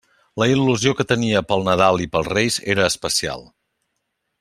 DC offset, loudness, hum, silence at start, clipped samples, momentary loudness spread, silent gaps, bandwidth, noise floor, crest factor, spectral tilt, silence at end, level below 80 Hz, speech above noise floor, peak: under 0.1%; -19 LUFS; none; 0.35 s; under 0.1%; 5 LU; none; 15.5 kHz; -75 dBFS; 18 dB; -4 dB/octave; 1 s; -50 dBFS; 56 dB; -2 dBFS